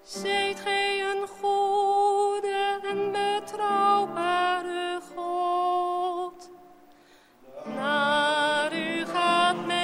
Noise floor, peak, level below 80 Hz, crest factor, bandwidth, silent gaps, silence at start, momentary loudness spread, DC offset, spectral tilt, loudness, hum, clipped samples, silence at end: -56 dBFS; -10 dBFS; -70 dBFS; 16 dB; 16 kHz; none; 0.05 s; 8 LU; under 0.1%; -3 dB/octave; -26 LUFS; none; under 0.1%; 0 s